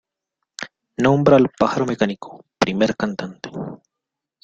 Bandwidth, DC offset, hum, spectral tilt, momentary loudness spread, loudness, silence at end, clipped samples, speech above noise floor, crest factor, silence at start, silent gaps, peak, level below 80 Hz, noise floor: 9 kHz; under 0.1%; none; -6.5 dB/octave; 20 LU; -19 LUFS; 0.7 s; under 0.1%; 65 dB; 20 dB; 0.6 s; none; -2 dBFS; -54 dBFS; -84 dBFS